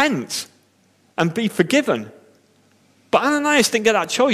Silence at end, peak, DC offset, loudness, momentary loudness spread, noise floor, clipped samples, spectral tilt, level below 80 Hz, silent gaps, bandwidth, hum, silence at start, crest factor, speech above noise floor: 0 s; -2 dBFS; under 0.1%; -19 LUFS; 12 LU; -59 dBFS; under 0.1%; -3.5 dB/octave; -64 dBFS; none; 15.5 kHz; none; 0 s; 18 dB; 40 dB